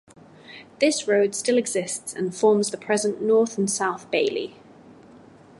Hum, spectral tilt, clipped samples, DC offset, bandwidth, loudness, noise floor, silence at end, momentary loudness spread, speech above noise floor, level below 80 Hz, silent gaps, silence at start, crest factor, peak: none; -3.5 dB/octave; under 0.1%; under 0.1%; 12 kHz; -23 LUFS; -49 dBFS; 0.65 s; 11 LU; 26 dB; -70 dBFS; none; 0.5 s; 18 dB; -6 dBFS